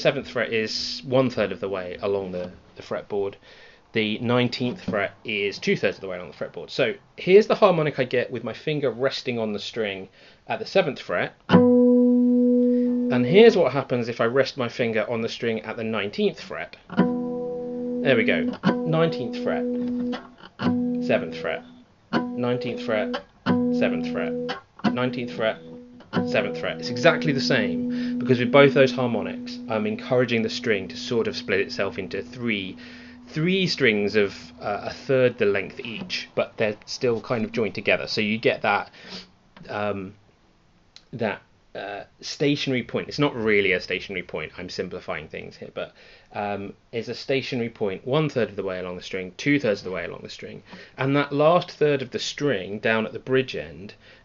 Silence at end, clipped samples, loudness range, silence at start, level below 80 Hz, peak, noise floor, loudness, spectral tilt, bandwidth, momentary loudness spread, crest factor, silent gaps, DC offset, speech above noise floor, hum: 0.3 s; under 0.1%; 7 LU; 0 s; -60 dBFS; -2 dBFS; -59 dBFS; -24 LUFS; -4 dB/octave; 7.4 kHz; 15 LU; 22 dB; none; under 0.1%; 35 dB; none